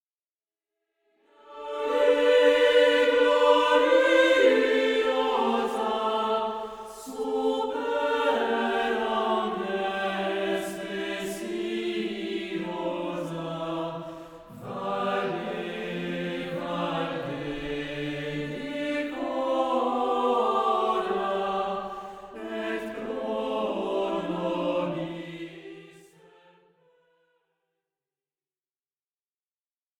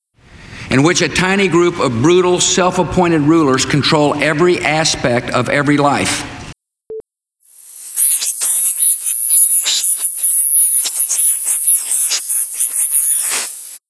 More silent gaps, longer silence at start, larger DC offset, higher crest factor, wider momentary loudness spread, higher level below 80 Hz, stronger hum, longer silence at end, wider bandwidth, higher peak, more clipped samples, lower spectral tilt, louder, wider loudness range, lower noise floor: neither; first, 1.45 s vs 0.35 s; neither; first, 20 dB vs 14 dB; first, 15 LU vs 8 LU; second, -60 dBFS vs -44 dBFS; neither; first, 4.1 s vs 0.1 s; first, 15.5 kHz vs 11 kHz; second, -8 dBFS vs 0 dBFS; neither; first, -5 dB/octave vs -3 dB/octave; second, -26 LUFS vs -11 LUFS; first, 11 LU vs 6 LU; first, under -90 dBFS vs -55 dBFS